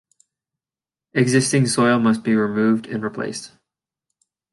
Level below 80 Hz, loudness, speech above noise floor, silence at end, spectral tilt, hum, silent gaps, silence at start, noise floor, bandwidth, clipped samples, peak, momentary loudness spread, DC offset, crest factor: -64 dBFS; -19 LUFS; over 71 dB; 1.05 s; -5 dB/octave; none; none; 1.15 s; under -90 dBFS; 11.5 kHz; under 0.1%; -4 dBFS; 11 LU; under 0.1%; 18 dB